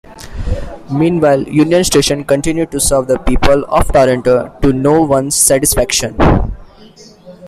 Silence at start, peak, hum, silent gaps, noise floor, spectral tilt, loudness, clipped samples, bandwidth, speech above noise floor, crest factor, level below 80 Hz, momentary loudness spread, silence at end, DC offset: 0.1 s; 0 dBFS; none; none; -39 dBFS; -4.5 dB/octave; -12 LUFS; under 0.1%; 16 kHz; 28 dB; 12 dB; -24 dBFS; 12 LU; 0 s; under 0.1%